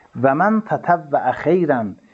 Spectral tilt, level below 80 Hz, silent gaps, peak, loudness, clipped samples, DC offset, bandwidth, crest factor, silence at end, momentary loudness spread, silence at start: -9 dB/octave; -60 dBFS; none; -2 dBFS; -18 LUFS; under 0.1%; under 0.1%; 7.2 kHz; 16 dB; 0.2 s; 4 LU; 0.15 s